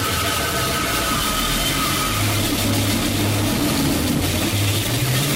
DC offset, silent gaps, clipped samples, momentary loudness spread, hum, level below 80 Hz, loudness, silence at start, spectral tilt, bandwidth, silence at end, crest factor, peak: under 0.1%; none; under 0.1%; 1 LU; none; -34 dBFS; -19 LUFS; 0 s; -3.5 dB/octave; 16.5 kHz; 0 s; 10 dB; -10 dBFS